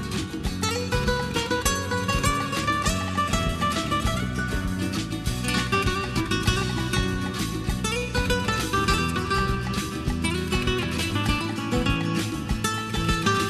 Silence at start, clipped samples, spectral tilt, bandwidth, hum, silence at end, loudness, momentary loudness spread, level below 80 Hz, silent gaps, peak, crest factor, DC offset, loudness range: 0 s; under 0.1%; -4.5 dB/octave; 13.5 kHz; none; 0 s; -25 LUFS; 4 LU; -34 dBFS; none; -8 dBFS; 16 dB; under 0.1%; 1 LU